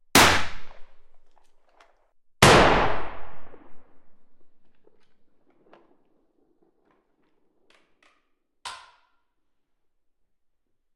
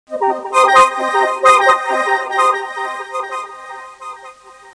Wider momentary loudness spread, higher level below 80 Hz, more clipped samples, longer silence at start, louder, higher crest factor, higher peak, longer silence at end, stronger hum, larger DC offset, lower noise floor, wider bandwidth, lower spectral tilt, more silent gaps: first, 26 LU vs 22 LU; first, -44 dBFS vs -58 dBFS; neither; about the same, 0.15 s vs 0.1 s; second, -18 LUFS vs -14 LUFS; first, 24 dB vs 16 dB; about the same, -2 dBFS vs 0 dBFS; first, 2.2 s vs 0.05 s; neither; neither; first, -70 dBFS vs -39 dBFS; first, 12.5 kHz vs 10.5 kHz; first, -3 dB/octave vs -1 dB/octave; neither